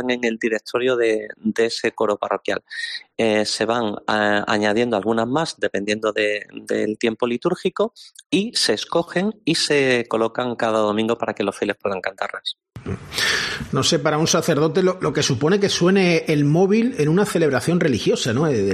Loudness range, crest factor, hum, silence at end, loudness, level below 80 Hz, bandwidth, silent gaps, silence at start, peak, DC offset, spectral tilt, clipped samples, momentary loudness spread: 4 LU; 16 dB; none; 0 s; -20 LUFS; -56 dBFS; 13 kHz; 8.26-8.30 s; 0 s; -4 dBFS; under 0.1%; -4.5 dB/octave; under 0.1%; 8 LU